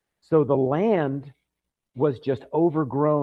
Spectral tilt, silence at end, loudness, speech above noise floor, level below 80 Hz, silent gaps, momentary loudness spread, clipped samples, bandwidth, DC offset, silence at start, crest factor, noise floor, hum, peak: -10.5 dB/octave; 0 s; -23 LUFS; 61 dB; -64 dBFS; none; 7 LU; under 0.1%; 5.2 kHz; under 0.1%; 0.3 s; 16 dB; -83 dBFS; none; -6 dBFS